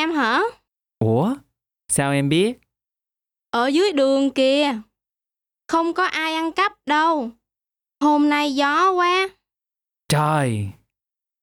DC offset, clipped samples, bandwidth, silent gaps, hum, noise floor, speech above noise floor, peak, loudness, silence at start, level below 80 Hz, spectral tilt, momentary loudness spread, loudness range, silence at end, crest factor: under 0.1%; under 0.1%; 17.5 kHz; none; none; -90 dBFS; 71 dB; -8 dBFS; -20 LUFS; 0 s; -60 dBFS; -4.5 dB/octave; 9 LU; 3 LU; 0.7 s; 12 dB